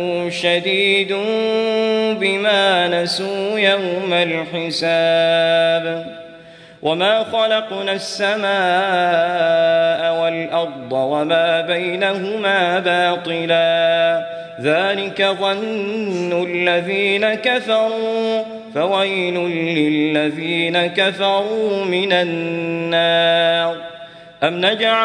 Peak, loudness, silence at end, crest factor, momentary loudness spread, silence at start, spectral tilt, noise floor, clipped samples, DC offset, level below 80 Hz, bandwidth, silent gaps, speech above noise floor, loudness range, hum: -2 dBFS; -17 LUFS; 0 s; 16 dB; 7 LU; 0 s; -4.5 dB/octave; -41 dBFS; under 0.1%; under 0.1%; -66 dBFS; 10.5 kHz; none; 24 dB; 2 LU; none